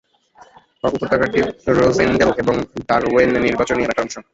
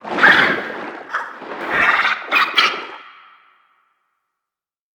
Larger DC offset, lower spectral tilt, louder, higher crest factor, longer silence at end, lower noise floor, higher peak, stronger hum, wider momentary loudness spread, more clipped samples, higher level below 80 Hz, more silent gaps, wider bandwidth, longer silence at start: neither; first, -5.5 dB/octave vs -2.5 dB/octave; about the same, -17 LUFS vs -15 LUFS; about the same, 16 dB vs 20 dB; second, 0.1 s vs 1.85 s; second, -49 dBFS vs -86 dBFS; about the same, -2 dBFS vs 0 dBFS; neither; second, 8 LU vs 18 LU; neither; first, -42 dBFS vs -60 dBFS; neither; second, 8 kHz vs over 20 kHz; first, 0.85 s vs 0.05 s